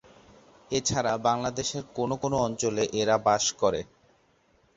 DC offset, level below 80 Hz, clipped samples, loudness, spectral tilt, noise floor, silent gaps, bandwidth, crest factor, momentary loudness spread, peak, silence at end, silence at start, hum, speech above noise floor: under 0.1%; -56 dBFS; under 0.1%; -27 LUFS; -3.5 dB/octave; -65 dBFS; none; 8 kHz; 18 dB; 8 LU; -10 dBFS; 0.95 s; 0.7 s; none; 38 dB